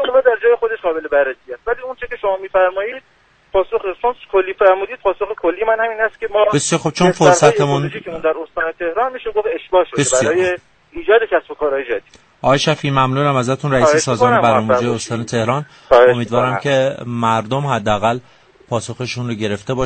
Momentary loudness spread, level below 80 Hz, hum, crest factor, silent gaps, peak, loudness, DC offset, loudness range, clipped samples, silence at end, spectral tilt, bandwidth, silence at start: 10 LU; -46 dBFS; none; 16 dB; none; 0 dBFS; -16 LUFS; under 0.1%; 4 LU; under 0.1%; 0 s; -4.5 dB/octave; 9 kHz; 0 s